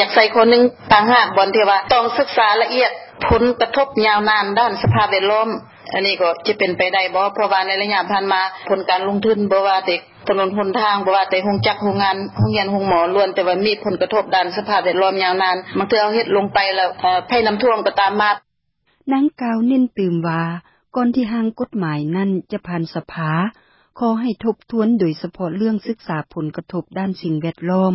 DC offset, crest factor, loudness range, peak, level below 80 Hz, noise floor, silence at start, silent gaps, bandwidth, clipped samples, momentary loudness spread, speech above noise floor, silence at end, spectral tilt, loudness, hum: under 0.1%; 18 dB; 6 LU; 0 dBFS; -46 dBFS; -66 dBFS; 0 s; none; 5.8 kHz; under 0.1%; 10 LU; 49 dB; 0 s; -9 dB/octave; -17 LUFS; none